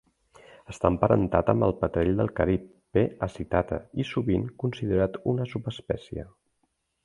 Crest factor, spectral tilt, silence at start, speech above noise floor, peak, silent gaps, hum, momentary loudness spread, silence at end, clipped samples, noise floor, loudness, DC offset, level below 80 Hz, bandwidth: 24 dB; -8.5 dB/octave; 0.7 s; 49 dB; -4 dBFS; none; none; 10 LU; 0.75 s; under 0.1%; -75 dBFS; -27 LUFS; under 0.1%; -44 dBFS; 11 kHz